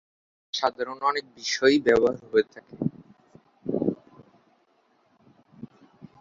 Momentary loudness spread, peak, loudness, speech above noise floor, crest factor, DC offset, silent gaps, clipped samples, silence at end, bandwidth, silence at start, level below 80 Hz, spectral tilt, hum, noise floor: 23 LU; -6 dBFS; -25 LUFS; 42 dB; 22 dB; under 0.1%; none; under 0.1%; 0.55 s; 7.8 kHz; 0.55 s; -62 dBFS; -4.5 dB/octave; none; -66 dBFS